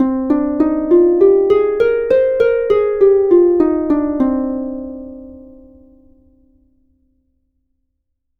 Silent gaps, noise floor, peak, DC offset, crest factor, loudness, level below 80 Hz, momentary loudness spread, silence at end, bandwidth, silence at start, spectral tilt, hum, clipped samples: none; -70 dBFS; 0 dBFS; under 0.1%; 14 dB; -14 LUFS; -44 dBFS; 14 LU; 3 s; 4.5 kHz; 0 s; -8.5 dB/octave; none; under 0.1%